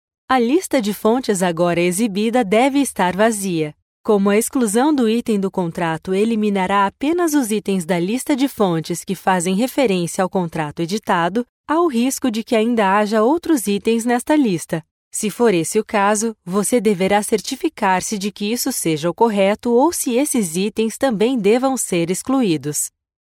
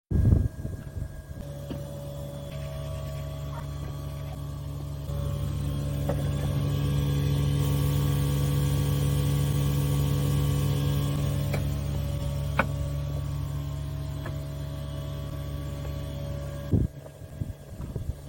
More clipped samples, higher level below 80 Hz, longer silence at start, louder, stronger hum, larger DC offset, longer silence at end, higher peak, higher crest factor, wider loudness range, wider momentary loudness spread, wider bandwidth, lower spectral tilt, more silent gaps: neither; second, -56 dBFS vs -36 dBFS; first, 0.3 s vs 0.1 s; first, -18 LUFS vs -30 LUFS; neither; neither; first, 0.35 s vs 0 s; first, -2 dBFS vs -6 dBFS; second, 16 dB vs 22 dB; second, 2 LU vs 10 LU; second, 6 LU vs 11 LU; about the same, 17.5 kHz vs 17 kHz; second, -4.5 dB/octave vs -6.5 dB/octave; first, 3.82-4.04 s, 11.49-11.64 s, 14.91-15.11 s vs none